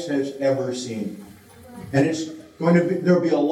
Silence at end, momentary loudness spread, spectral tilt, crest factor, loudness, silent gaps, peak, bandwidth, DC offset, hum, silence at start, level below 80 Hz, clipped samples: 0 s; 14 LU; -6.5 dB/octave; 16 dB; -22 LUFS; none; -6 dBFS; 12.5 kHz; under 0.1%; none; 0 s; -64 dBFS; under 0.1%